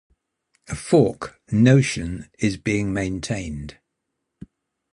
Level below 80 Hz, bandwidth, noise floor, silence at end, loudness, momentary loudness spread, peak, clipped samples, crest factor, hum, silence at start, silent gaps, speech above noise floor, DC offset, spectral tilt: -44 dBFS; 11 kHz; -79 dBFS; 1.2 s; -21 LUFS; 18 LU; -2 dBFS; under 0.1%; 20 dB; none; 0.7 s; none; 58 dB; under 0.1%; -6.5 dB/octave